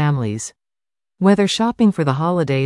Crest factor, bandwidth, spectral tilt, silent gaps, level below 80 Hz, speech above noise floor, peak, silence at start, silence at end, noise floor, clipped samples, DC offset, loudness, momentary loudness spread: 16 dB; 11.5 kHz; -6 dB/octave; none; -54 dBFS; over 73 dB; -2 dBFS; 0 s; 0 s; under -90 dBFS; under 0.1%; under 0.1%; -17 LUFS; 10 LU